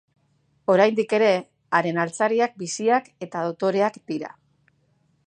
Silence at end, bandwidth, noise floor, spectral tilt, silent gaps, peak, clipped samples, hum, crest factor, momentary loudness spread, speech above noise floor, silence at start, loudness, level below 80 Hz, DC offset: 1 s; 10 kHz; -66 dBFS; -5 dB/octave; none; -4 dBFS; under 0.1%; none; 20 dB; 13 LU; 44 dB; 0.7 s; -23 LUFS; -76 dBFS; under 0.1%